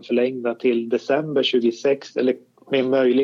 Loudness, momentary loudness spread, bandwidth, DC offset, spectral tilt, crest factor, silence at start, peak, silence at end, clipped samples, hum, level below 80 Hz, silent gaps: -21 LUFS; 5 LU; 7.4 kHz; under 0.1%; -5.5 dB/octave; 14 dB; 0.05 s; -6 dBFS; 0 s; under 0.1%; none; -78 dBFS; none